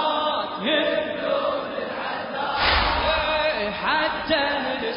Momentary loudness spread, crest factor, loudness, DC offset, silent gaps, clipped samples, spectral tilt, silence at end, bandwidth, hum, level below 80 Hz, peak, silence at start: 8 LU; 16 dB; -23 LUFS; under 0.1%; none; under 0.1%; -8.5 dB/octave; 0 s; 5.4 kHz; none; -40 dBFS; -8 dBFS; 0 s